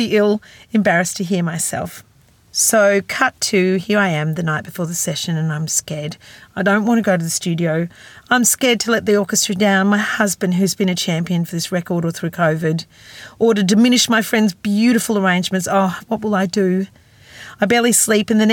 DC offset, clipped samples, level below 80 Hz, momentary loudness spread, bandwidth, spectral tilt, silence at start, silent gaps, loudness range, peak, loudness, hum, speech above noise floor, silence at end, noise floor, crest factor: under 0.1%; under 0.1%; -58 dBFS; 10 LU; 18 kHz; -4 dB/octave; 0 s; none; 3 LU; -2 dBFS; -17 LUFS; none; 23 dB; 0 s; -40 dBFS; 16 dB